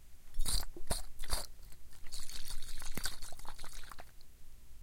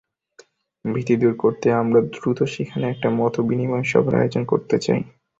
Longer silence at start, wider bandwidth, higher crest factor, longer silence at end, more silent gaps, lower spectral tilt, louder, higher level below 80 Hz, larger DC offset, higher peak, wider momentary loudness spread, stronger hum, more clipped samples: second, 0 s vs 0.85 s; first, 16.5 kHz vs 7.8 kHz; about the same, 16 dB vs 18 dB; second, 0 s vs 0.3 s; neither; second, -2 dB/octave vs -7.5 dB/octave; second, -43 LUFS vs -21 LUFS; first, -42 dBFS vs -56 dBFS; neither; second, -18 dBFS vs -4 dBFS; first, 21 LU vs 7 LU; neither; neither